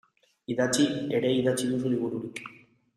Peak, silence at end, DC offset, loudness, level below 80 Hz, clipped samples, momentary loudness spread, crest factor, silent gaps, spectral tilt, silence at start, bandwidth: -12 dBFS; 0.4 s; under 0.1%; -27 LUFS; -66 dBFS; under 0.1%; 16 LU; 16 dB; none; -4.5 dB/octave; 0.5 s; 15 kHz